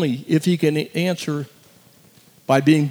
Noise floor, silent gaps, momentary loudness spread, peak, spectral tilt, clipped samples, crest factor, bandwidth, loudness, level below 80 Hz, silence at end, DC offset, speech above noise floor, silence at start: -52 dBFS; none; 14 LU; -4 dBFS; -6.5 dB/octave; under 0.1%; 18 dB; over 20 kHz; -20 LUFS; -74 dBFS; 0 s; under 0.1%; 33 dB; 0 s